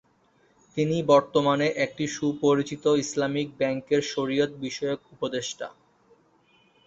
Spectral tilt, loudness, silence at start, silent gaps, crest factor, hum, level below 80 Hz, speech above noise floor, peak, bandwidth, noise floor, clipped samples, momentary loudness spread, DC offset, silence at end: -5 dB/octave; -26 LUFS; 0.75 s; none; 20 dB; none; -66 dBFS; 39 dB; -6 dBFS; 8 kHz; -64 dBFS; under 0.1%; 11 LU; under 0.1%; 1.15 s